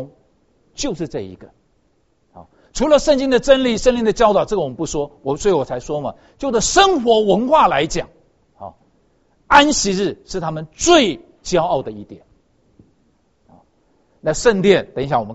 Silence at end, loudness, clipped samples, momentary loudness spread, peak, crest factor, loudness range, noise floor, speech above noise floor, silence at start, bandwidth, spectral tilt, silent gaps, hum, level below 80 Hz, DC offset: 0 s; -16 LUFS; under 0.1%; 17 LU; 0 dBFS; 18 dB; 5 LU; -62 dBFS; 46 dB; 0 s; 8.2 kHz; -3.5 dB/octave; none; none; -40 dBFS; under 0.1%